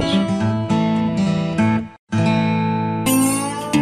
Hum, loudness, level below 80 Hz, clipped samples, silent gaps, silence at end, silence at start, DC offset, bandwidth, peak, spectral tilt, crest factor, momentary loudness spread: none; -19 LUFS; -46 dBFS; under 0.1%; 1.99-2.07 s; 0 s; 0 s; under 0.1%; 15 kHz; -4 dBFS; -5.5 dB/octave; 14 dB; 4 LU